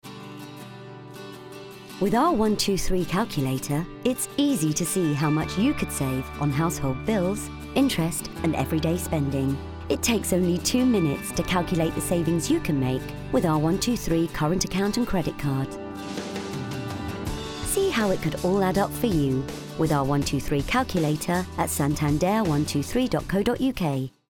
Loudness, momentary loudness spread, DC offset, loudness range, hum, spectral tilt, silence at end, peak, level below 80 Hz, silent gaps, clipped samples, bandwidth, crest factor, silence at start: -25 LUFS; 9 LU; under 0.1%; 3 LU; none; -5 dB/octave; 0.25 s; -8 dBFS; -42 dBFS; none; under 0.1%; 19 kHz; 16 dB; 0.05 s